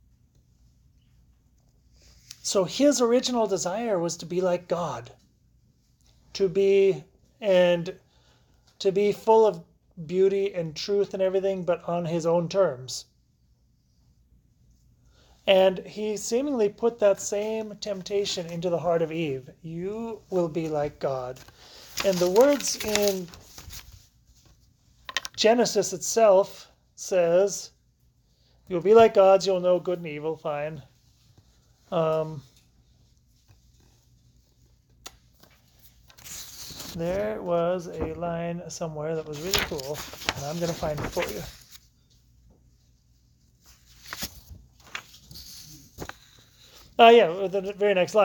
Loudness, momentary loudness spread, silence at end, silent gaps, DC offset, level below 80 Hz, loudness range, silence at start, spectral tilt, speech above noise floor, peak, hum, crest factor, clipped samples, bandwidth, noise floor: -25 LUFS; 21 LU; 0 s; none; under 0.1%; -56 dBFS; 13 LU; 2.45 s; -4 dB/octave; 40 dB; -4 dBFS; none; 24 dB; under 0.1%; 19 kHz; -64 dBFS